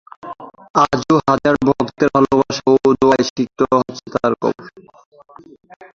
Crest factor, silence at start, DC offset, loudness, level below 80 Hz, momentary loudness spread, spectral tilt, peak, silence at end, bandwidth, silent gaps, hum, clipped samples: 16 dB; 0.25 s; under 0.1%; -16 LUFS; -48 dBFS; 14 LU; -6 dB/octave; 0 dBFS; 1.25 s; 7.6 kHz; 0.70-0.74 s, 3.30-3.36 s; none; under 0.1%